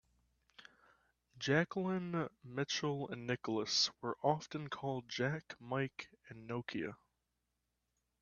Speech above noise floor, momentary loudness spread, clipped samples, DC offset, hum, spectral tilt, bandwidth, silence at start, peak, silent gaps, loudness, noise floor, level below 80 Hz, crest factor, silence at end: 47 dB; 11 LU; under 0.1%; under 0.1%; 60 Hz at -70 dBFS; -4.5 dB/octave; 7.4 kHz; 0.6 s; -18 dBFS; none; -39 LUFS; -86 dBFS; -76 dBFS; 24 dB; 1.25 s